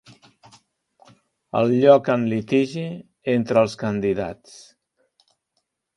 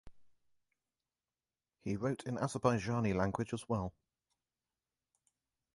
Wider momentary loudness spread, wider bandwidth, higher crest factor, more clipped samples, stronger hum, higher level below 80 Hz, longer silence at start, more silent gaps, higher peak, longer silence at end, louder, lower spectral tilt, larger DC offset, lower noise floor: first, 16 LU vs 8 LU; about the same, 11 kHz vs 11.5 kHz; about the same, 22 dB vs 24 dB; neither; neither; about the same, -58 dBFS vs -62 dBFS; first, 1.55 s vs 0.05 s; neither; first, 0 dBFS vs -16 dBFS; second, 1.65 s vs 1.85 s; first, -21 LUFS vs -37 LUFS; about the same, -7 dB/octave vs -6.5 dB/octave; neither; second, -75 dBFS vs under -90 dBFS